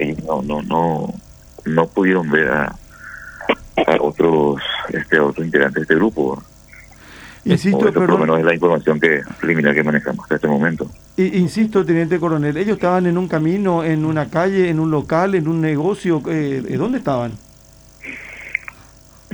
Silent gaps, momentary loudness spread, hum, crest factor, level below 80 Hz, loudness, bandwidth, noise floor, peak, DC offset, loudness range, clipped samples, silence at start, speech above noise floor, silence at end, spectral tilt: none; 12 LU; none; 18 dB; -46 dBFS; -17 LUFS; over 20 kHz; -45 dBFS; 0 dBFS; under 0.1%; 3 LU; under 0.1%; 0 s; 29 dB; 0.6 s; -7 dB/octave